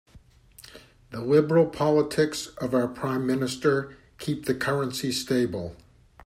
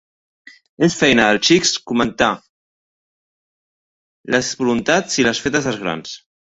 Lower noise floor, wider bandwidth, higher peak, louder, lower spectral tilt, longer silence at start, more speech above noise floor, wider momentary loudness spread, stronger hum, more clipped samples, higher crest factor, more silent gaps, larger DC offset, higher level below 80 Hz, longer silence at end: second, -54 dBFS vs under -90 dBFS; first, 16 kHz vs 8.2 kHz; second, -8 dBFS vs 0 dBFS; second, -25 LUFS vs -16 LUFS; first, -5.5 dB/octave vs -3.5 dB/octave; second, 0.15 s vs 0.8 s; second, 29 dB vs over 73 dB; about the same, 14 LU vs 12 LU; neither; neither; about the same, 18 dB vs 20 dB; second, none vs 2.50-4.24 s; neither; second, -58 dBFS vs -50 dBFS; about the same, 0.5 s vs 0.4 s